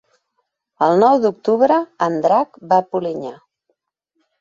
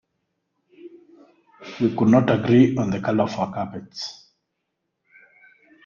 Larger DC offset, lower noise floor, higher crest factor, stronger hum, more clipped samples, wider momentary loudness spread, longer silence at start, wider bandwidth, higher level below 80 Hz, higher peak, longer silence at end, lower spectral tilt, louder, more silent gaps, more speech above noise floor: neither; second, -72 dBFS vs -78 dBFS; about the same, 16 dB vs 20 dB; neither; neither; second, 11 LU vs 16 LU; about the same, 0.8 s vs 0.85 s; about the same, 7.4 kHz vs 7.2 kHz; second, -66 dBFS vs -58 dBFS; about the same, -2 dBFS vs -4 dBFS; second, 1.05 s vs 1.75 s; about the same, -7 dB/octave vs -7.5 dB/octave; first, -17 LUFS vs -21 LUFS; neither; about the same, 56 dB vs 58 dB